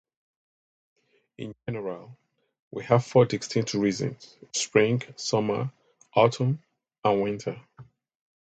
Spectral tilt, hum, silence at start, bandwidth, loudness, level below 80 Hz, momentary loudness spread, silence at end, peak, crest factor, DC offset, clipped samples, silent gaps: -5.5 dB/octave; none; 1.4 s; 9 kHz; -26 LUFS; -64 dBFS; 17 LU; 0.65 s; -6 dBFS; 22 dB; under 0.1%; under 0.1%; 2.62-2.71 s, 6.98-7.02 s